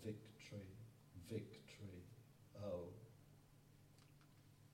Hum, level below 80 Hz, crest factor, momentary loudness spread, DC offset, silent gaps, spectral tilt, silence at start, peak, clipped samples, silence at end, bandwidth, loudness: none; -78 dBFS; 20 dB; 18 LU; under 0.1%; none; -6.5 dB/octave; 0 s; -36 dBFS; under 0.1%; 0 s; 16.5 kHz; -56 LUFS